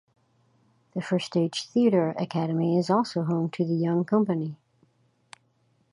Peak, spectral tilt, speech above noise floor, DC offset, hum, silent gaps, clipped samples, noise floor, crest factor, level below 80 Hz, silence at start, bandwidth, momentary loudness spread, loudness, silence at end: -10 dBFS; -7 dB/octave; 43 dB; under 0.1%; none; none; under 0.1%; -68 dBFS; 18 dB; -74 dBFS; 0.95 s; 11 kHz; 7 LU; -26 LUFS; 1.4 s